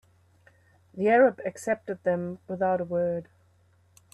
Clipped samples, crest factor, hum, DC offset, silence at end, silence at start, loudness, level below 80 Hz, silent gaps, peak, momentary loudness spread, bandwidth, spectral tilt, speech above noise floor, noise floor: under 0.1%; 20 dB; none; under 0.1%; 0.9 s; 0.95 s; -27 LUFS; -70 dBFS; none; -8 dBFS; 14 LU; 12 kHz; -7 dB/octave; 37 dB; -63 dBFS